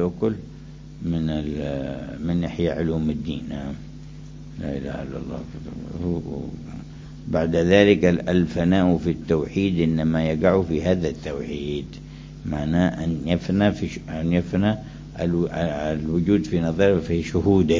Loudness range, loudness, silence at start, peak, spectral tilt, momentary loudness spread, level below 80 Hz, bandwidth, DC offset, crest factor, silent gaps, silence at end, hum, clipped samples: 10 LU; -23 LUFS; 0 s; -2 dBFS; -7.5 dB/octave; 17 LU; -38 dBFS; 7.6 kHz; under 0.1%; 20 dB; none; 0 s; none; under 0.1%